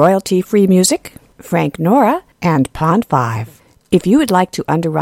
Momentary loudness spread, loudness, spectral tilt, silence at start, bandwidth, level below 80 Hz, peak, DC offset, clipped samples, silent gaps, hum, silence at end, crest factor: 7 LU; -14 LUFS; -5.5 dB/octave; 0 s; 16.5 kHz; -46 dBFS; 0 dBFS; under 0.1%; under 0.1%; none; none; 0 s; 14 dB